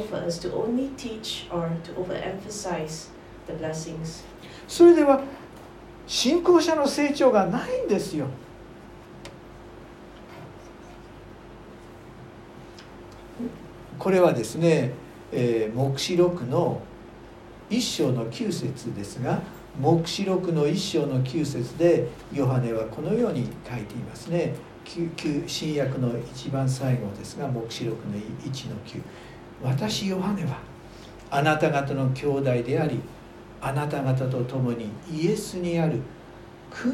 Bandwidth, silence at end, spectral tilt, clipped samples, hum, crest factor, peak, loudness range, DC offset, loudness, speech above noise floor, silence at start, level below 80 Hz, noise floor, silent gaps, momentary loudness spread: 15.5 kHz; 0 s; -6 dB/octave; under 0.1%; none; 20 dB; -6 dBFS; 10 LU; under 0.1%; -25 LUFS; 20 dB; 0 s; -54 dBFS; -45 dBFS; none; 23 LU